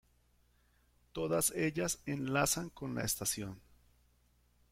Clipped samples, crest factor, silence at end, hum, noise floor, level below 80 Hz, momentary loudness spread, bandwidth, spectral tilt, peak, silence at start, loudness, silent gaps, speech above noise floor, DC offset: under 0.1%; 20 dB; 1.15 s; 60 Hz at -65 dBFS; -71 dBFS; -62 dBFS; 9 LU; 16.5 kHz; -3.5 dB/octave; -18 dBFS; 1.15 s; -35 LUFS; none; 35 dB; under 0.1%